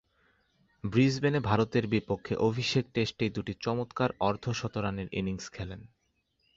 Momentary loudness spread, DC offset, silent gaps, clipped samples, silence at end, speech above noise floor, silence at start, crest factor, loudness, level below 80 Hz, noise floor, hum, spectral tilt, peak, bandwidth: 11 LU; under 0.1%; none; under 0.1%; 0.7 s; 45 dB; 0.85 s; 20 dB; -30 LUFS; -54 dBFS; -75 dBFS; none; -6 dB/octave; -10 dBFS; 7.8 kHz